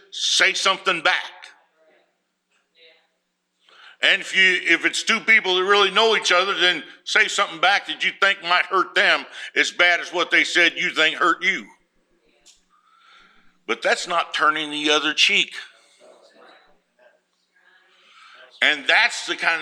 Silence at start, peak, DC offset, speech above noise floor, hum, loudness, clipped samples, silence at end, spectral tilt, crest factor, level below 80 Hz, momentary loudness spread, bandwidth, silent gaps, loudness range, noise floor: 0.15 s; -2 dBFS; under 0.1%; 53 dB; none; -18 LUFS; under 0.1%; 0 s; -0.5 dB/octave; 20 dB; -78 dBFS; 7 LU; 15 kHz; none; 8 LU; -73 dBFS